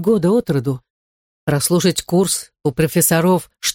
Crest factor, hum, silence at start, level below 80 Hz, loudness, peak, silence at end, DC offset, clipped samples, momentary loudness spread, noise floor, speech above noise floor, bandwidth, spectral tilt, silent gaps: 16 dB; none; 0 s; -48 dBFS; -17 LUFS; -2 dBFS; 0 s; under 0.1%; under 0.1%; 9 LU; under -90 dBFS; over 73 dB; 17 kHz; -4.5 dB/octave; 0.90-1.47 s